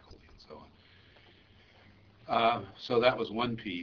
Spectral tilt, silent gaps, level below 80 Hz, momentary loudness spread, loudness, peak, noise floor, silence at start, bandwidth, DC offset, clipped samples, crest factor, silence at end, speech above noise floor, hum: -6.5 dB/octave; none; -64 dBFS; 25 LU; -30 LUFS; -10 dBFS; -60 dBFS; 0.1 s; 5.4 kHz; under 0.1%; under 0.1%; 24 dB; 0 s; 30 dB; none